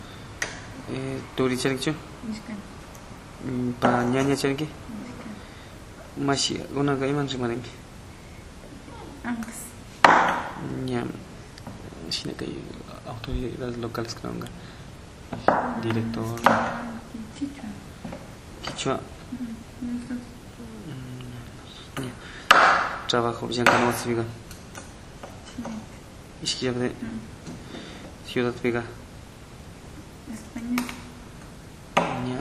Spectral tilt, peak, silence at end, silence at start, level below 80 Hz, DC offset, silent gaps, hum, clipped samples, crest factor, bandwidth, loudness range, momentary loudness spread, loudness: -4.5 dB/octave; 0 dBFS; 0 s; 0 s; -48 dBFS; under 0.1%; none; none; under 0.1%; 28 dB; 15 kHz; 12 LU; 21 LU; -26 LUFS